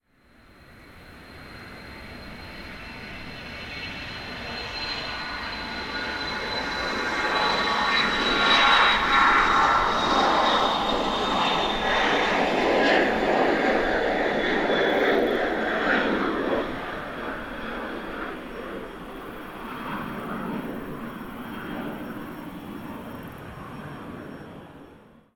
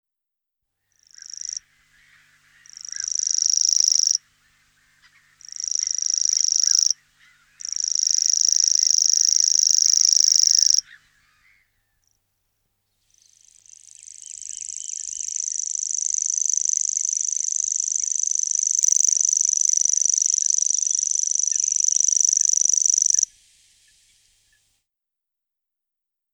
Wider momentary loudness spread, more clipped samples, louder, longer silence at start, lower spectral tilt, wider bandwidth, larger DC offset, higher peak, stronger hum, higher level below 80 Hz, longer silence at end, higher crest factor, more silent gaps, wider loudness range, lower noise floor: first, 20 LU vs 15 LU; neither; second, -23 LUFS vs -17 LUFS; second, 0.7 s vs 1.25 s; first, -4 dB/octave vs 7.5 dB/octave; about the same, 19.5 kHz vs over 20 kHz; neither; about the same, -6 dBFS vs -4 dBFS; neither; first, -46 dBFS vs -72 dBFS; second, 0.35 s vs 3.1 s; about the same, 20 dB vs 20 dB; neither; first, 17 LU vs 12 LU; second, -56 dBFS vs -84 dBFS